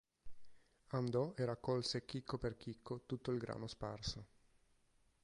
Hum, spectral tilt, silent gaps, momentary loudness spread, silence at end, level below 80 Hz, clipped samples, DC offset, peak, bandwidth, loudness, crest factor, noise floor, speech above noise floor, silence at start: none; -6 dB/octave; none; 8 LU; 1 s; -64 dBFS; under 0.1%; under 0.1%; -26 dBFS; 11 kHz; -43 LUFS; 18 dB; -75 dBFS; 33 dB; 0.25 s